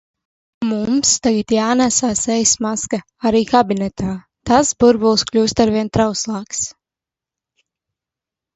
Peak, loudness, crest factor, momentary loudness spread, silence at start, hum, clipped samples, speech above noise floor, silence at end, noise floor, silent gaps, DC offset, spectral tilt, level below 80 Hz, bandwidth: 0 dBFS; -16 LUFS; 18 dB; 10 LU; 0.6 s; none; under 0.1%; 72 dB; 1.85 s; -88 dBFS; none; under 0.1%; -3.5 dB/octave; -46 dBFS; 8.2 kHz